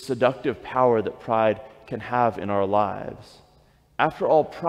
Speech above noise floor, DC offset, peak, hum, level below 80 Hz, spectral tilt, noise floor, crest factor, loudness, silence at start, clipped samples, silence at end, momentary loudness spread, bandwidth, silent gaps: 35 dB; under 0.1%; -6 dBFS; none; -58 dBFS; -7 dB/octave; -58 dBFS; 18 dB; -23 LUFS; 0 s; under 0.1%; 0 s; 14 LU; 12.5 kHz; none